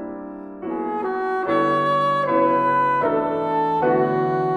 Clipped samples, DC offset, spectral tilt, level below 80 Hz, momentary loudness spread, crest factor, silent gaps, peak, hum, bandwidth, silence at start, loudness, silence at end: under 0.1%; under 0.1%; -7.5 dB/octave; -58 dBFS; 11 LU; 14 dB; none; -6 dBFS; none; 11.5 kHz; 0 s; -20 LUFS; 0 s